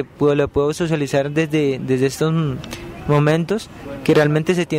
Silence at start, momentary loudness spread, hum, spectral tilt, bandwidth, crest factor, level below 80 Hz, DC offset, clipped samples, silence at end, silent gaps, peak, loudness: 0 s; 9 LU; none; -6.5 dB/octave; 15.5 kHz; 14 dB; -44 dBFS; under 0.1%; under 0.1%; 0 s; none; -6 dBFS; -18 LUFS